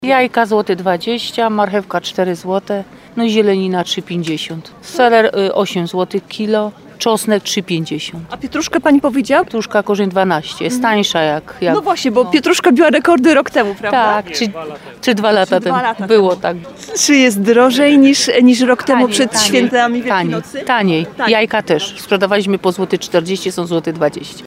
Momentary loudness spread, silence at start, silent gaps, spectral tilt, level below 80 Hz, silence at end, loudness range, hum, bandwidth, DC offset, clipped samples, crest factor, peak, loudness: 10 LU; 0 s; none; -4 dB/octave; -54 dBFS; 0 s; 6 LU; none; 16 kHz; under 0.1%; under 0.1%; 14 dB; 0 dBFS; -14 LUFS